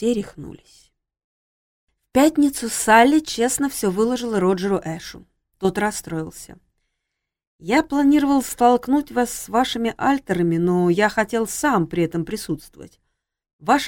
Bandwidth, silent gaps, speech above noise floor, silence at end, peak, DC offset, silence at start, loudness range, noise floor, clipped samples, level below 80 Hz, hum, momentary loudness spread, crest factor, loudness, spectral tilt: 17 kHz; 1.24-1.87 s, 7.47-7.59 s, 13.53-13.59 s; 61 dB; 0 s; -2 dBFS; under 0.1%; 0 s; 6 LU; -81 dBFS; under 0.1%; -50 dBFS; none; 14 LU; 18 dB; -20 LUFS; -4.5 dB/octave